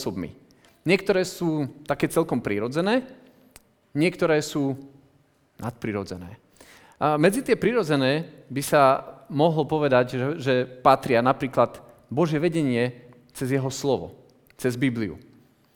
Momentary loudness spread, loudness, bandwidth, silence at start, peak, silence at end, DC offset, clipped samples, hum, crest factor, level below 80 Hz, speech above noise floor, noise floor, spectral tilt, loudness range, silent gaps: 13 LU; -24 LUFS; over 20 kHz; 0 s; -2 dBFS; 0.55 s; under 0.1%; under 0.1%; none; 22 dB; -58 dBFS; 39 dB; -62 dBFS; -6 dB/octave; 6 LU; none